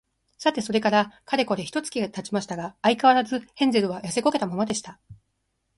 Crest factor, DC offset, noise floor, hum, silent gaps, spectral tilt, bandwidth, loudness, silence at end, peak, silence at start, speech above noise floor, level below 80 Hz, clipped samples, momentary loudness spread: 20 dB; under 0.1%; -75 dBFS; none; none; -4.5 dB/octave; 11.5 kHz; -24 LUFS; 0.65 s; -6 dBFS; 0.4 s; 51 dB; -64 dBFS; under 0.1%; 10 LU